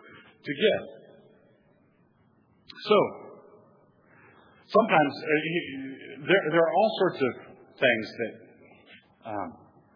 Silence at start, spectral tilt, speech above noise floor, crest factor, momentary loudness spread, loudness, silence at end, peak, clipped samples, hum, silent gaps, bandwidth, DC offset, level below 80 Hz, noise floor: 0.15 s; -7.5 dB/octave; 38 dB; 22 dB; 18 LU; -26 LUFS; 0.4 s; -6 dBFS; under 0.1%; none; none; 5.4 kHz; under 0.1%; -80 dBFS; -64 dBFS